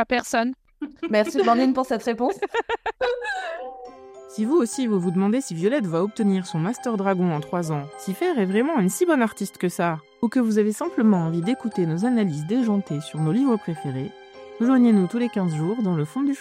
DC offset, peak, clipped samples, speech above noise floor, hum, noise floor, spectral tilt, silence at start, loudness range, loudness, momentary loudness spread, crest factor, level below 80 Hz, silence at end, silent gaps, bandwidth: under 0.1%; -6 dBFS; under 0.1%; 20 dB; none; -42 dBFS; -6.5 dB/octave; 0 s; 2 LU; -23 LUFS; 10 LU; 16 dB; -62 dBFS; 0 s; none; 15.5 kHz